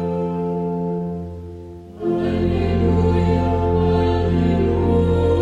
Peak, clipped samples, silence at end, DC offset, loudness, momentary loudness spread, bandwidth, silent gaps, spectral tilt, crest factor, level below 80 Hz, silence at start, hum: -6 dBFS; under 0.1%; 0 s; under 0.1%; -19 LUFS; 13 LU; 7.4 kHz; none; -9.5 dB/octave; 14 dB; -30 dBFS; 0 s; none